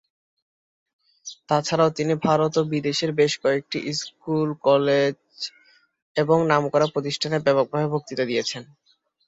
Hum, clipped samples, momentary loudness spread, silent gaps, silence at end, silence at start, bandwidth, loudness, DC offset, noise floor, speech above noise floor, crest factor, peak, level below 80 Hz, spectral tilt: none; under 0.1%; 13 LU; 6.02-6.15 s; 0.65 s; 1.25 s; 8 kHz; -22 LUFS; under 0.1%; -58 dBFS; 36 dB; 20 dB; -4 dBFS; -66 dBFS; -5 dB/octave